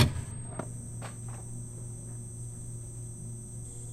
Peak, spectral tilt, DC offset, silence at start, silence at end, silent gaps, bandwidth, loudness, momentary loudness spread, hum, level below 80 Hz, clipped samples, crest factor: -8 dBFS; -4.5 dB/octave; under 0.1%; 0 s; 0 s; none; 14 kHz; -39 LUFS; 3 LU; none; -48 dBFS; under 0.1%; 28 dB